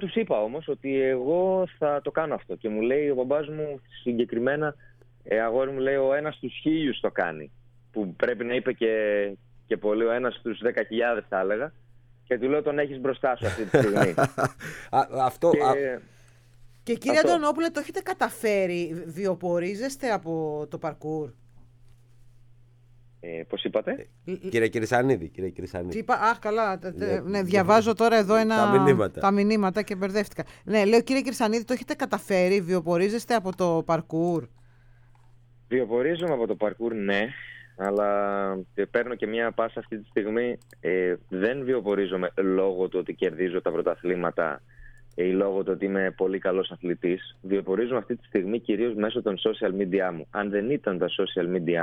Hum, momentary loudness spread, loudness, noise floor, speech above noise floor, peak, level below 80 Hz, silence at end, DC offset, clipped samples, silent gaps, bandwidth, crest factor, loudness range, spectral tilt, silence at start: none; 10 LU; -26 LUFS; -54 dBFS; 29 dB; -4 dBFS; -58 dBFS; 0 s; under 0.1%; under 0.1%; none; 17.5 kHz; 22 dB; 6 LU; -6 dB/octave; 0 s